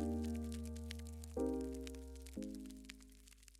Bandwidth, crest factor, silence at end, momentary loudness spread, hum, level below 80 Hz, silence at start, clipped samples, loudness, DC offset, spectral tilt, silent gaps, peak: 16 kHz; 18 dB; 0 s; 15 LU; none; -52 dBFS; 0 s; under 0.1%; -46 LUFS; under 0.1%; -6.5 dB/octave; none; -28 dBFS